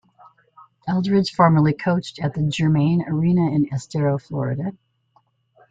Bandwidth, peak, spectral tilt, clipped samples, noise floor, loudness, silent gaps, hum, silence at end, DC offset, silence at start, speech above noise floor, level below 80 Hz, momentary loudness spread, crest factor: 7.8 kHz; -2 dBFS; -7.5 dB/octave; under 0.1%; -63 dBFS; -20 LUFS; none; none; 1 s; under 0.1%; 0.85 s; 43 dB; -54 dBFS; 9 LU; 18 dB